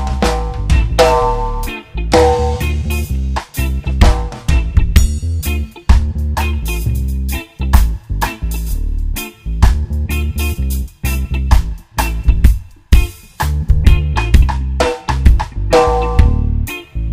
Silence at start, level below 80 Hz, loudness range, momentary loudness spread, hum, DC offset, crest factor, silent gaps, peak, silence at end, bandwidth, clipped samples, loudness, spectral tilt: 0 s; -14 dBFS; 4 LU; 9 LU; none; under 0.1%; 14 dB; none; 0 dBFS; 0 s; 16 kHz; 0.9%; -16 LUFS; -6 dB/octave